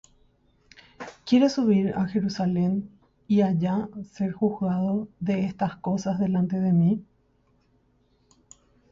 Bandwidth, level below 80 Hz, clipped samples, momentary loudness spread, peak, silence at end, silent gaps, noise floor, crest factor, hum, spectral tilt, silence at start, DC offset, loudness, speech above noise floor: 7.6 kHz; -60 dBFS; under 0.1%; 10 LU; -8 dBFS; 1.9 s; none; -65 dBFS; 18 dB; none; -8 dB/octave; 1 s; under 0.1%; -25 LUFS; 41 dB